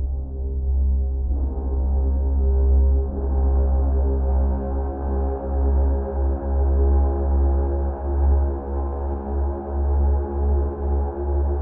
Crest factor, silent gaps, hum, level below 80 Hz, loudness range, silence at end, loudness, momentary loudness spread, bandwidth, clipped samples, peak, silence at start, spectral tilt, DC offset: 10 dB; none; none; -20 dBFS; 2 LU; 0 s; -23 LUFS; 6 LU; 1.8 kHz; under 0.1%; -10 dBFS; 0 s; -13.5 dB/octave; under 0.1%